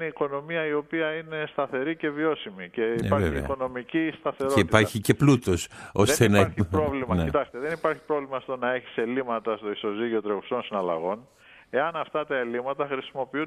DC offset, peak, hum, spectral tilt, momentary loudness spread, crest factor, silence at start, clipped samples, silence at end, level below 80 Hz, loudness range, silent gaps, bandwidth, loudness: under 0.1%; -2 dBFS; none; -5.5 dB/octave; 10 LU; 24 dB; 0 s; under 0.1%; 0 s; -48 dBFS; 6 LU; none; 15 kHz; -26 LUFS